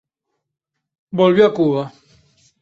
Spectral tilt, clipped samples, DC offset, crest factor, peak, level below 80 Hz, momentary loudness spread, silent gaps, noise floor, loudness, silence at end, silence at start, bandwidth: -8 dB/octave; under 0.1%; under 0.1%; 18 dB; -2 dBFS; -60 dBFS; 15 LU; none; -79 dBFS; -16 LUFS; 0.75 s; 1.15 s; 7.4 kHz